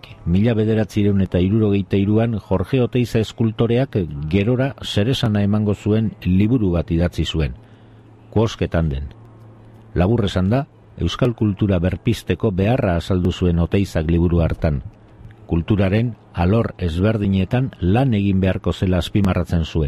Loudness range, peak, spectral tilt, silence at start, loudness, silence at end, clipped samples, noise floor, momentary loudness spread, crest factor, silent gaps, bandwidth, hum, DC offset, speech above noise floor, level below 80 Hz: 3 LU; -6 dBFS; -8 dB/octave; 0.1 s; -19 LUFS; 0 s; under 0.1%; -45 dBFS; 5 LU; 14 dB; none; 13 kHz; none; under 0.1%; 27 dB; -30 dBFS